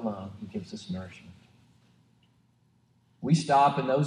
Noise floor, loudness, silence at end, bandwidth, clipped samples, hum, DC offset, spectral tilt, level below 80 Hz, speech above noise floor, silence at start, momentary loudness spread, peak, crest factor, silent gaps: -66 dBFS; -28 LUFS; 0 s; 10.5 kHz; under 0.1%; none; under 0.1%; -6.5 dB/octave; -70 dBFS; 41 dB; 0 s; 18 LU; -12 dBFS; 18 dB; none